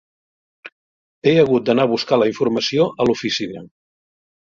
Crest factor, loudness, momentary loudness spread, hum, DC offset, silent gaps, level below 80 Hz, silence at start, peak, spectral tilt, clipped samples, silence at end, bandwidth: 18 dB; -18 LUFS; 8 LU; none; under 0.1%; 0.72-1.22 s; -58 dBFS; 0.65 s; -2 dBFS; -5.5 dB/octave; under 0.1%; 0.85 s; 7.6 kHz